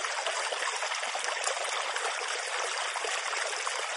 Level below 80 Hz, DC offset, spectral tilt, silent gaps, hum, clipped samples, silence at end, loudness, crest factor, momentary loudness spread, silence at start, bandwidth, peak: under -90 dBFS; under 0.1%; 4 dB/octave; none; none; under 0.1%; 0 s; -31 LUFS; 18 dB; 1 LU; 0 s; 11.5 kHz; -14 dBFS